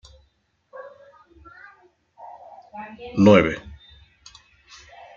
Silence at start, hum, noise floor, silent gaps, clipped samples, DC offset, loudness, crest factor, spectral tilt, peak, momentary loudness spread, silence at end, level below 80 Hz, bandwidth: 0.75 s; none; -67 dBFS; none; under 0.1%; under 0.1%; -18 LUFS; 22 dB; -7 dB/octave; -2 dBFS; 30 LU; 1.6 s; -54 dBFS; 7.2 kHz